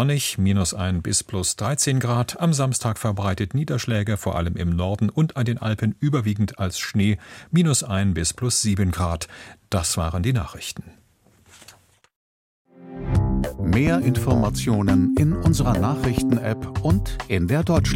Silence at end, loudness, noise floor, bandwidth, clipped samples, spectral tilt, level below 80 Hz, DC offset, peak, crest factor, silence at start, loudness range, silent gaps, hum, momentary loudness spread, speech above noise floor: 0 s; -22 LUFS; -57 dBFS; 16.5 kHz; under 0.1%; -5 dB/octave; -36 dBFS; under 0.1%; -4 dBFS; 16 dB; 0 s; 8 LU; 12.16-12.65 s; none; 6 LU; 36 dB